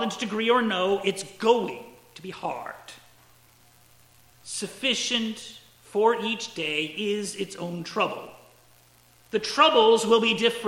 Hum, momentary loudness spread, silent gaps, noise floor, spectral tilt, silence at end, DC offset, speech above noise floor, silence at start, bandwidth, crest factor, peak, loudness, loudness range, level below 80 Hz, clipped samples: none; 20 LU; none; -57 dBFS; -3 dB/octave; 0 s; under 0.1%; 32 dB; 0 s; 16.5 kHz; 22 dB; -4 dBFS; -25 LUFS; 7 LU; -70 dBFS; under 0.1%